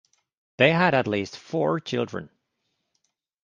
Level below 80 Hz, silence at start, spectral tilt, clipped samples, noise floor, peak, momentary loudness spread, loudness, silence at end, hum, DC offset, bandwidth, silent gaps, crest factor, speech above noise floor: -62 dBFS; 0.6 s; -6 dB/octave; under 0.1%; -77 dBFS; -2 dBFS; 12 LU; -23 LUFS; 1.15 s; none; under 0.1%; 7.6 kHz; none; 24 dB; 54 dB